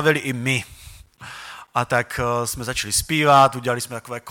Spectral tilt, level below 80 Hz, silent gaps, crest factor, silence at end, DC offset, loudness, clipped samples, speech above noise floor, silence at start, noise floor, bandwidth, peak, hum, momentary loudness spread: -3.5 dB/octave; -46 dBFS; none; 16 dB; 0 s; under 0.1%; -20 LUFS; under 0.1%; 23 dB; 0 s; -43 dBFS; 17.5 kHz; -4 dBFS; none; 21 LU